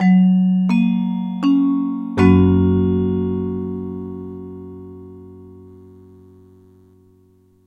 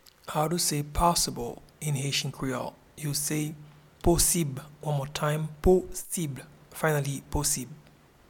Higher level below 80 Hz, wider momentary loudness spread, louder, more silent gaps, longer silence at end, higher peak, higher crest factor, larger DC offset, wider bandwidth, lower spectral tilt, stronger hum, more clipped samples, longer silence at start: second, -48 dBFS vs -42 dBFS; first, 22 LU vs 13 LU; first, -17 LUFS vs -28 LUFS; neither; first, 2 s vs 0.5 s; first, -2 dBFS vs -8 dBFS; about the same, 16 dB vs 20 dB; neither; second, 5.6 kHz vs 19 kHz; first, -9.5 dB/octave vs -4 dB/octave; neither; neither; second, 0 s vs 0.25 s